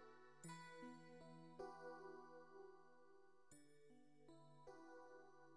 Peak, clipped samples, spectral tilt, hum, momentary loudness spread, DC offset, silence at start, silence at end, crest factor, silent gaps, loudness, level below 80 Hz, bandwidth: -44 dBFS; under 0.1%; -5 dB/octave; none; 11 LU; under 0.1%; 0 s; 0 s; 20 dB; none; -62 LUFS; -88 dBFS; 11 kHz